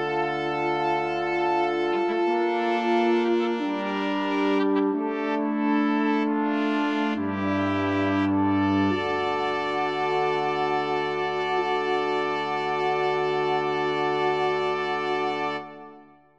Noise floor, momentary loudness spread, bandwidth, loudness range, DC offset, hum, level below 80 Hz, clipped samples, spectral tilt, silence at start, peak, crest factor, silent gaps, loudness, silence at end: -50 dBFS; 4 LU; 8 kHz; 1 LU; 0.1%; none; -64 dBFS; under 0.1%; -6.5 dB/octave; 0 s; -12 dBFS; 14 dB; none; -25 LUFS; 0.35 s